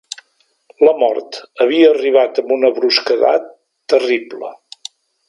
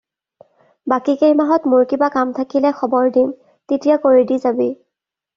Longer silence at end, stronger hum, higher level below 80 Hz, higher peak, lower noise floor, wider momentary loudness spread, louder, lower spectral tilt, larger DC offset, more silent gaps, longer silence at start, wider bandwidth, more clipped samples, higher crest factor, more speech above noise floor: first, 0.75 s vs 0.6 s; neither; second, -72 dBFS vs -62 dBFS; about the same, 0 dBFS vs -2 dBFS; second, -60 dBFS vs -80 dBFS; first, 21 LU vs 8 LU; about the same, -14 LUFS vs -16 LUFS; second, -3 dB/octave vs -4.5 dB/octave; neither; neither; about the same, 0.8 s vs 0.85 s; first, 11.5 kHz vs 7 kHz; neither; about the same, 16 dB vs 14 dB; second, 47 dB vs 65 dB